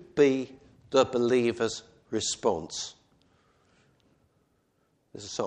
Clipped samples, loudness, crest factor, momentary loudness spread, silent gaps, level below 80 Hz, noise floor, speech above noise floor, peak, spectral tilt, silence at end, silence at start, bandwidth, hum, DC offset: under 0.1%; -28 LUFS; 22 dB; 15 LU; none; -66 dBFS; -71 dBFS; 45 dB; -8 dBFS; -4 dB/octave; 0 s; 0 s; 10 kHz; none; under 0.1%